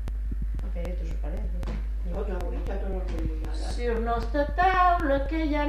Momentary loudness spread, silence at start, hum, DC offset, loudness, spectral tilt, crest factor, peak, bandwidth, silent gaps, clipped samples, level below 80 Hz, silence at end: 11 LU; 0 s; none; under 0.1%; -29 LUFS; -7 dB/octave; 16 dB; -10 dBFS; 9.4 kHz; none; under 0.1%; -30 dBFS; 0 s